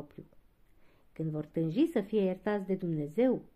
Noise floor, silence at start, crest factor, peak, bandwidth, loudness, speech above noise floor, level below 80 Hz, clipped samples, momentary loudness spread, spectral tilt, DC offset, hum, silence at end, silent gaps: -61 dBFS; 0 s; 16 dB; -18 dBFS; 14 kHz; -32 LUFS; 30 dB; -66 dBFS; under 0.1%; 9 LU; -9 dB/octave; under 0.1%; none; 0.15 s; none